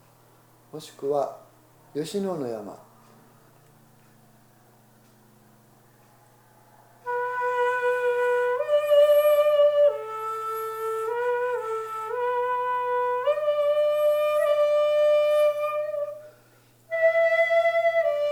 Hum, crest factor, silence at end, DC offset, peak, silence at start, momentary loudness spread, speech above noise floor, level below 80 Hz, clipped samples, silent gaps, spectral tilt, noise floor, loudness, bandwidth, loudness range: 60 Hz at -60 dBFS; 16 dB; 0 s; under 0.1%; -10 dBFS; 0.75 s; 13 LU; 28 dB; -76 dBFS; under 0.1%; none; -4 dB/octave; -57 dBFS; -24 LUFS; 17 kHz; 14 LU